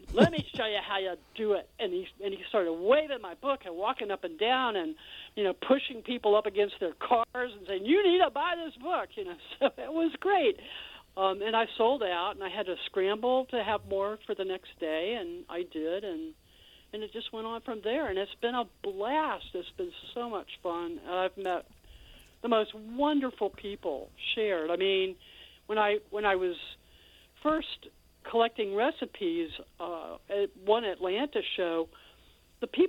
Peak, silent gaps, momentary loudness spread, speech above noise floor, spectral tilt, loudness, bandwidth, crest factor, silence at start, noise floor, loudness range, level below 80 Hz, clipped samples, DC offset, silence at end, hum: -8 dBFS; none; 12 LU; 30 dB; -6 dB/octave; -31 LUFS; 16.5 kHz; 24 dB; 0 s; -60 dBFS; 6 LU; -60 dBFS; under 0.1%; under 0.1%; 0 s; none